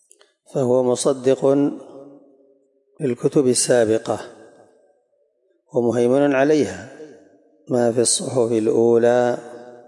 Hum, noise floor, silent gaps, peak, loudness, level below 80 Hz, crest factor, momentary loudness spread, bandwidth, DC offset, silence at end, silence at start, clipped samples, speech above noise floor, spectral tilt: none; -65 dBFS; none; -6 dBFS; -19 LUFS; -72 dBFS; 14 dB; 12 LU; 11.5 kHz; under 0.1%; 0.1 s; 0.55 s; under 0.1%; 47 dB; -4.5 dB/octave